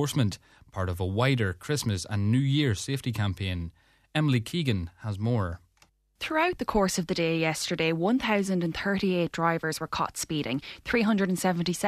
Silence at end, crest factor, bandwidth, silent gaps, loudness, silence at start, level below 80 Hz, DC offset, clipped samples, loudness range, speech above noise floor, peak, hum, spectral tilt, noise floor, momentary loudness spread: 0 s; 18 dB; 14 kHz; none; -28 LUFS; 0 s; -52 dBFS; under 0.1%; under 0.1%; 3 LU; 37 dB; -10 dBFS; none; -5.5 dB/octave; -65 dBFS; 8 LU